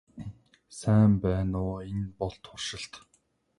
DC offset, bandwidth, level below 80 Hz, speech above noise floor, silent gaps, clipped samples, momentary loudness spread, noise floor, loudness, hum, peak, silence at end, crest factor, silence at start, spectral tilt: under 0.1%; 11.5 kHz; -46 dBFS; 43 dB; none; under 0.1%; 22 LU; -70 dBFS; -29 LUFS; none; -12 dBFS; 0.6 s; 16 dB; 0.15 s; -7 dB/octave